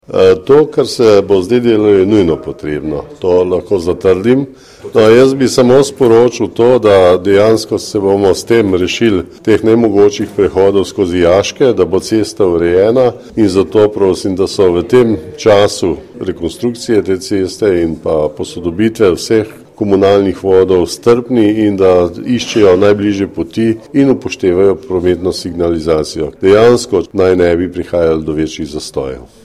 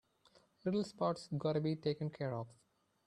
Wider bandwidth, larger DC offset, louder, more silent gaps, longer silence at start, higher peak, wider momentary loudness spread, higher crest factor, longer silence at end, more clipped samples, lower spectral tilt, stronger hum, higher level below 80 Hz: first, 14 kHz vs 10.5 kHz; neither; first, -11 LUFS vs -39 LUFS; neither; second, 0.1 s vs 0.65 s; first, 0 dBFS vs -22 dBFS; about the same, 9 LU vs 7 LU; second, 10 dB vs 18 dB; second, 0.2 s vs 0.55 s; first, 0.3% vs under 0.1%; second, -6 dB/octave vs -7.5 dB/octave; neither; first, -40 dBFS vs -76 dBFS